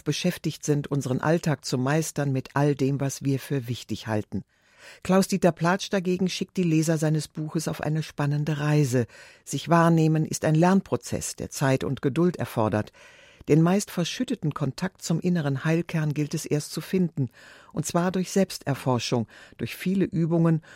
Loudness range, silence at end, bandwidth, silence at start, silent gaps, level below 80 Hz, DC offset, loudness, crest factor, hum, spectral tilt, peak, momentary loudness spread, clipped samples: 4 LU; 0 s; 16 kHz; 0.05 s; none; -58 dBFS; under 0.1%; -25 LUFS; 18 dB; none; -6 dB/octave; -8 dBFS; 9 LU; under 0.1%